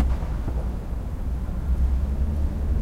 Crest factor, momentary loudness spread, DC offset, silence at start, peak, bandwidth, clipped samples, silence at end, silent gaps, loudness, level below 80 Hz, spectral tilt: 14 dB; 6 LU; 0.6%; 0 s; -10 dBFS; 5.4 kHz; under 0.1%; 0 s; none; -28 LUFS; -24 dBFS; -8.5 dB/octave